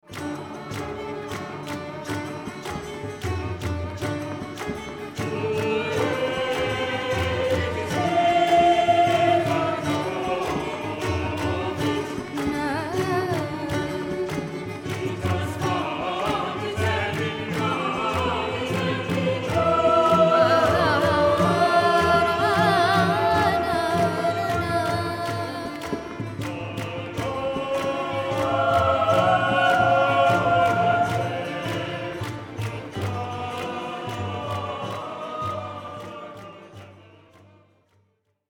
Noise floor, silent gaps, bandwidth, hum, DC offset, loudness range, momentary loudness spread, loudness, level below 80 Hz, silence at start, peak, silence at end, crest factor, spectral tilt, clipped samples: -68 dBFS; none; 18 kHz; none; under 0.1%; 11 LU; 14 LU; -24 LUFS; -48 dBFS; 0.1 s; -6 dBFS; 1.5 s; 18 dB; -5.5 dB/octave; under 0.1%